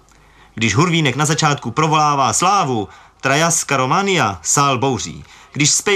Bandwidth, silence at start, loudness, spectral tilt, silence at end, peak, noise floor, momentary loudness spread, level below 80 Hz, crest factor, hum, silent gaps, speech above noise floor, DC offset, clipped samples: 15.5 kHz; 0.55 s; -16 LUFS; -3.5 dB/octave; 0 s; -2 dBFS; -48 dBFS; 9 LU; -52 dBFS; 14 dB; none; none; 32 dB; under 0.1%; under 0.1%